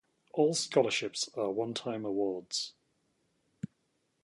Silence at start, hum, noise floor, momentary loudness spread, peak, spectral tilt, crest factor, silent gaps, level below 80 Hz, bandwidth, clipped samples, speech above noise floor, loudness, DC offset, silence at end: 0.35 s; none; -77 dBFS; 17 LU; -12 dBFS; -3.5 dB/octave; 22 dB; none; -76 dBFS; 11.5 kHz; under 0.1%; 46 dB; -32 LUFS; under 0.1%; 0.6 s